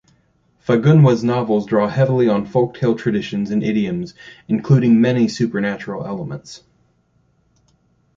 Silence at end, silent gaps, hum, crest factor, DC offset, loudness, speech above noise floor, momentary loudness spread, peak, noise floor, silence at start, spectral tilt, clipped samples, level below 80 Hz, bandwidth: 1.6 s; none; none; 16 dB; under 0.1%; -17 LUFS; 44 dB; 14 LU; -2 dBFS; -61 dBFS; 0.7 s; -8 dB/octave; under 0.1%; -54 dBFS; 7.6 kHz